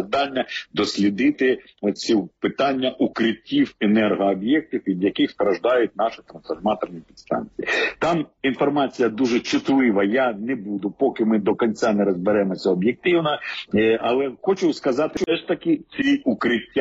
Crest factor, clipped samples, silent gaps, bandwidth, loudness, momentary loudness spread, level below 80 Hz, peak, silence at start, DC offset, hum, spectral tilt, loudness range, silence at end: 14 dB; under 0.1%; none; 8 kHz; -21 LUFS; 7 LU; -58 dBFS; -8 dBFS; 0 s; under 0.1%; none; -4 dB/octave; 2 LU; 0 s